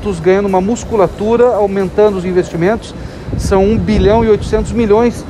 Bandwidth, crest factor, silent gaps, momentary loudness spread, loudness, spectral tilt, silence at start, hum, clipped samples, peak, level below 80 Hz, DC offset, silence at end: 12.5 kHz; 12 dB; none; 6 LU; -12 LUFS; -7 dB/octave; 0 s; none; under 0.1%; 0 dBFS; -26 dBFS; under 0.1%; 0 s